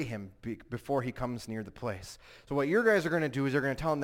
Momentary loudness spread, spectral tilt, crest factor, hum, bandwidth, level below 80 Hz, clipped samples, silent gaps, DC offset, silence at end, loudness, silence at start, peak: 15 LU; -6.5 dB/octave; 18 dB; none; 16.5 kHz; -56 dBFS; under 0.1%; none; under 0.1%; 0 s; -32 LUFS; 0 s; -14 dBFS